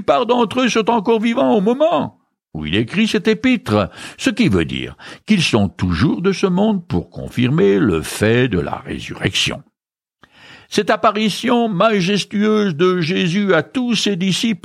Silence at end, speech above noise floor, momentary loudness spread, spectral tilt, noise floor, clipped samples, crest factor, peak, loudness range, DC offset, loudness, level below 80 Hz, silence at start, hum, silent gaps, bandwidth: 0.05 s; 68 dB; 9 LU; -5.5 dB/octave; -84 dBFS; under 0.1%; 16 dB; -2 dBFS; 3 LU; under 0.1%; -17 LUFS; -44 dBFS; 0 s; none; none; 14.5 kHz